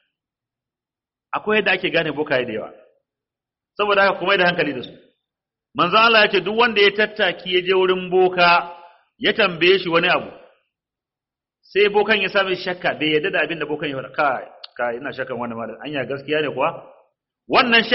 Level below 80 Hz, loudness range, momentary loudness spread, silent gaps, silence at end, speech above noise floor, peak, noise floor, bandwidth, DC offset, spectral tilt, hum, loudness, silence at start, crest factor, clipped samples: -60 dBFS; 7 LU; 13 LU; none; 0 s; 70 dB; -2 dBFS; -89 dBFS; 6 kHz; under 0.1%; -1.5 dB/octave; none; -18 LUFS; 1.35 s; 18 dB; under 0.1%